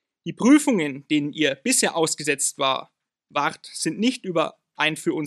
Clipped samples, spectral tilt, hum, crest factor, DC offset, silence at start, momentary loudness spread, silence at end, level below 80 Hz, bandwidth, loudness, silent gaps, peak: under 0.1%; -3 dB/octave; none; 18 dB; under 0.1%; 0.25 s; 10 LU; 0 s; -78 dBFS; 14 kHz; -22 LUFS; none; -4 dBFS